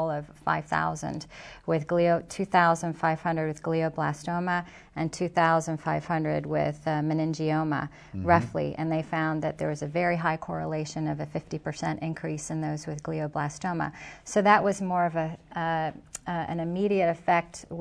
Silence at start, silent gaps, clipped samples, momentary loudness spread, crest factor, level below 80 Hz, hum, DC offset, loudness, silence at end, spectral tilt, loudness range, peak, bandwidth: 0 s; none; under 0.1%; 10 LU; 22 dB; -56 dBFS; none; under 0.1%; -28 LUFS; 0 s; -6 dB/octave; 4 LU; -6 dBFS; 11 kHz